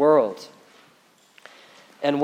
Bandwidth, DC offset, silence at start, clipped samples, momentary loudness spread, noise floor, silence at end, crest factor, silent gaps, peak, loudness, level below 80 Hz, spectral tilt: 14 kHz; under 0.1%; 0 s; under 0.1%; 28 LU; -58 dBFS; 0 s; 18 dB; none; -6 dBFS; -23 LUFS; -86 dBFS; -6.5 dB/octave